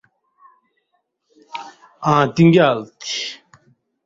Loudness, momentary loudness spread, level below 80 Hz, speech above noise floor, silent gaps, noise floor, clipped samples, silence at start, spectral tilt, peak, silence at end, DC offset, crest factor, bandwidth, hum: -17 LUFS; 21 LU; -58 dBFS; 54 dB; none; -70 dBFS; under 0.1%; 1.55 s; -6 dB/octave; 0 dBFS; 0.7 s; under 0.1%; 20 dB; 7.8 kHz; none